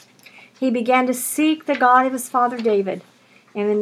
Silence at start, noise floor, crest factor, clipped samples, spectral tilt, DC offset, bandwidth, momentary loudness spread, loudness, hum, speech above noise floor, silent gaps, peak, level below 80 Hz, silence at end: 0.6 s; -47 dBFS; 18 dB; under 0.1%; -4 dB/octave; under 0.1%; 18.5 kHz; 11 LU; -19 LUFS; none; 29 dB; none; -2 dBFS; -84 dBFS; 0 s